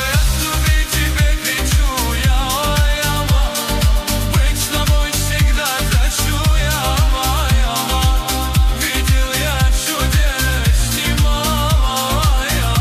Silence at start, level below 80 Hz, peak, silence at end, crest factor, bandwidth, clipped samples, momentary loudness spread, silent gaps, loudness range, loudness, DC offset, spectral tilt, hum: 0 s; -16 dBFS; -4 dBFS; 0 s; 12 dB; 15.5 kHz; under 0.1%; 1 LU; none; 0 LU; -16 LUFS; under 0.1%; -3.5 dB/octave; none